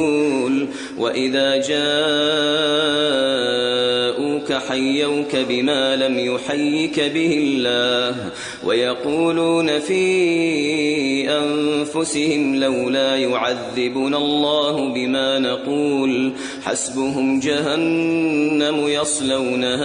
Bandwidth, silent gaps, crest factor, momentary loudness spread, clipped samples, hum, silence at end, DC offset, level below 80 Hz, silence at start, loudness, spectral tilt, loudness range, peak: 10.5 kHz; none; 14 dB; 5 LU; under 0.1%; none; 0 s; under 0.1%; -58 dBFS; 0 s; -19 LUFS; -3.5 dB/octave; 2 LU; -4 dBFS